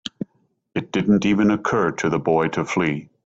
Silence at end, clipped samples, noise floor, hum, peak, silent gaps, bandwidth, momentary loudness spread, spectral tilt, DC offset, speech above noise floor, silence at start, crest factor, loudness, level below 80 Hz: 0.2 s; under 0.1%; -60 dBFS; none; -6 dBFS; none; 8 kHz; 13 LU; -6 dB/octave; under 0.1%; 40 dB; 0.05 s; 16 dB; -21 LUFS; -54 dBFS